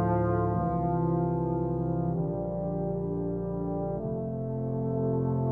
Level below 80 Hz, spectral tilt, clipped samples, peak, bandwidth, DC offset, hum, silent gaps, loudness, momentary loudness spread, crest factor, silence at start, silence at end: -46 dBFS; -13 dB/octave; under 0.1%; -16 dBFS; 2.4 kHz; under 0.1%; none; none; -30 LUFS; 5 LU; 14 dB; 0 s; 0 s